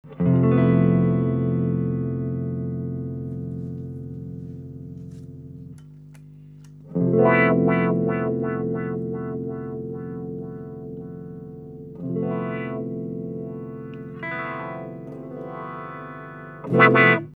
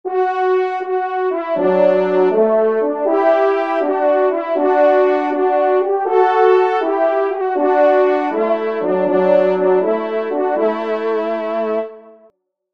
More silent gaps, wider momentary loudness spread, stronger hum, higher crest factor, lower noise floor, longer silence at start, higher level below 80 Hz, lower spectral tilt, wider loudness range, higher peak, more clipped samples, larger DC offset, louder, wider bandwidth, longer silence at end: neither; first, 20 LU vs 7 LU; first, 50 Hz at -45 dBFS vs none; first, 22 dB vs 14 dB; second, -44 dBFS vs -54 dBFS; about the same, 0.05 s vs 0.05 s; first, -54 dBFS vs -70 dBFS; first, -10 dB/octave vs -7.5 dB/octave; first, 12 LU vs 2 LU; about the same, -2 dBFS vs -2 dBFS; neither; second, under 0.1% vs 0.3%; second, -23 LUFS vs -16 LUFS; second, 4.6 kHz vs 5.8 kHz; second, 0.05 s vs 0.65 s